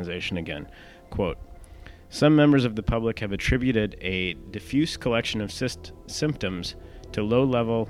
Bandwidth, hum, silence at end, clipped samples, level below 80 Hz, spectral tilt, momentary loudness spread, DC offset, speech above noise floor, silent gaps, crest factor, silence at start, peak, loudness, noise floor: 13.5 kHz; none; 0 s; under 0.1%; -42 dBFS; -6 dB/octave; 16 LU; under 0.1%; 20 dB; none; 20 dB; 0 s; -6 dBFS; -25 LUFS; -45 dBFS